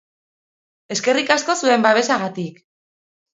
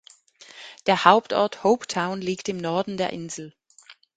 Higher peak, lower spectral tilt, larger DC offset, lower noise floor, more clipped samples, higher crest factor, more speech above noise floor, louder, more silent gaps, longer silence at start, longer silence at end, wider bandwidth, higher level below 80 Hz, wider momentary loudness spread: about the same, 0 dBFS vs 0 dBFS; second, -3 dB/octave vs -4.5 dB/octave; neither; first, under -90 dBFS vs -53 dBFS; neither; about the same, 20 dB vs 24 dB; first, over 72 dB vs 30 dB; first, -18 LUFS vs -23 LUFS; neither; first, 0.9 s vs 0.55 s; first, 0.85 s vs 0.25 s; second, 8 kHz vs 9.4 kHz; second, -72 dBFS vs -66 dBFS; second, 12 LU vs 19 LU